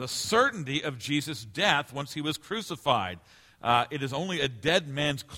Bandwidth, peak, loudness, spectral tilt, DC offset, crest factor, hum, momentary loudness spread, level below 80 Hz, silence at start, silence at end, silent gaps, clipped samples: 16.5 kHz; -6 dBFS; -28 LUFS; -4 dB/octave; under 0.1%; 22 dB; none; 10 LU; -60 dBFS; 0 s; 0 s; none; under 0.1%